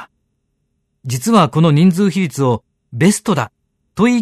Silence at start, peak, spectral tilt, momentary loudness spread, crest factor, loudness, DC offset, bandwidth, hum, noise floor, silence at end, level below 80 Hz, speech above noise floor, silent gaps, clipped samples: 0 s; 0 dBFS; -6 dB/octave; 15 LU; 16 dB; -15 LUFS; under 0.1%; 13.5 kHz; none; -68 dBFS; 0 s; -54 dBFS; 55 dB; none; under 0.1%